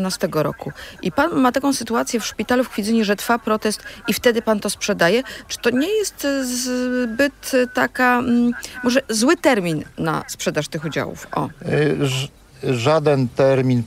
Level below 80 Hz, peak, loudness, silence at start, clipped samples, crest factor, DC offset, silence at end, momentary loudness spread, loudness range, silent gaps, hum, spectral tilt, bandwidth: -50 dBFS; -2 dBFS; -20 LUFS; 0 s; under 0.1%; 16 dB; under 0.1%; 0 s; 8 LU; 2 LU; none; none; -4.5 dB/octave; 16 kHz